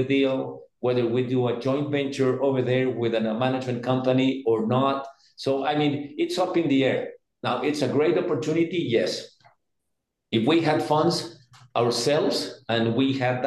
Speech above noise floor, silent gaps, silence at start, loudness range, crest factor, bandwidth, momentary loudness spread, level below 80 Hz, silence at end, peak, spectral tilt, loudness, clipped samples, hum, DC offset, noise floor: 57 dB; none; 0 s; 2 LU; 16 dB; 12.5 kHz; 8 LU; -70 dBFS; 0 s; -8 dBFS; -6 dB/octave; -24 LUFS; under 0.1%; none; under 0.1%; -80 dBFS